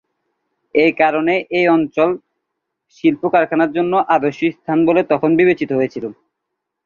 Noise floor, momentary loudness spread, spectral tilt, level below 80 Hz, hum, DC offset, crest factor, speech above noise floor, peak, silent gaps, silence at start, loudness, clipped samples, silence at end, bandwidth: -78 dBFS; 7 LU; -7.5 dB/octave; -60 dBFS; none; under 0.1%; 16 dB; 62 dB; -2 dBFS; none; 0.75 s; -16 LUFS; under 0.1%; 0.75 s; 6.8 kHz